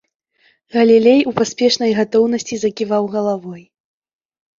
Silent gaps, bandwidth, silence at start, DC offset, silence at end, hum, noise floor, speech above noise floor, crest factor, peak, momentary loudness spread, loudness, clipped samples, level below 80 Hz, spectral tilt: none; 7.6 kHz; 0.75 s; under 0.1%; 1 s; none; -59 dBFS; 44 dB; 16 dB; -2 dBFS; 11 LU; -15 LUFS; under 0.1%; -60 dBFS; -4.5 dB/octave